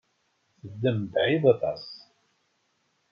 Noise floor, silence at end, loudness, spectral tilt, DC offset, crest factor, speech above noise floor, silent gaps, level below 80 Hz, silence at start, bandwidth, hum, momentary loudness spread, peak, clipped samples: -72 dBFS; 1.15 s; -25 LUFS; -8.5 dB/octave; under 0.1%; 20 dB; 47 dB; none; -70 dBFS; 0.65 s; 6.6 kHz; none; 22 LU; -8 dBFS; under 0.1%